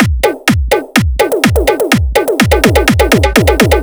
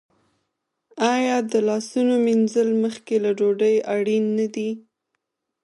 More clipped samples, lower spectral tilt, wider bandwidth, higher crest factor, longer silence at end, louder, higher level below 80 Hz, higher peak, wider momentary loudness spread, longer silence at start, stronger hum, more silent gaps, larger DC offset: first, 0.9% vs under 0.1%; about the same, -5 dB/octave vs -5.5 dB/octave; first, over 20 kHz vs 11.5 kHz; second, 10 dB vs 16 dB; second, 0 s vs 0.85 s; first, -10 LUFS vs -21 LUFS; first, -18 dBFS vs -76 dBFS; first, 0 dBFS vs -6 dBFS; about the same, 4 LU vs 5 LU; second, 0 s vs 0.95 s; neither; neither; neither